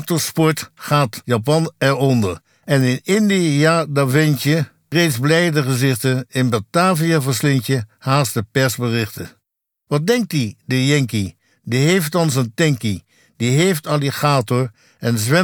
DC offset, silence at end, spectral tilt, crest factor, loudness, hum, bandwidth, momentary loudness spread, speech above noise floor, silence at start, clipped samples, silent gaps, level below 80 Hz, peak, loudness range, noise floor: under 0.1%; 0 s; -5.5 dB/octave; 16 dB; -18 LUFS; none; over 20 kHz; 8 LU; 58 dB; 0 s; under 0.1%; none; -58 dBFS; -2 dBFS; 3 LU; -75 dBFS